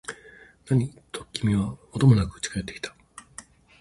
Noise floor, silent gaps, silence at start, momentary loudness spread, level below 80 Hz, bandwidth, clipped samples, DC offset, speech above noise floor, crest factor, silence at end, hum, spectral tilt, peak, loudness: -51 dBFS; none; 0.1 s; 23 LU; -46 dBFS; 11.5 kHz; under 0.1%; under 0.1%; 28 dB; 20 dB; 0.4 s; none; -6 dB/octave; -6 dBFS; -25 LUFS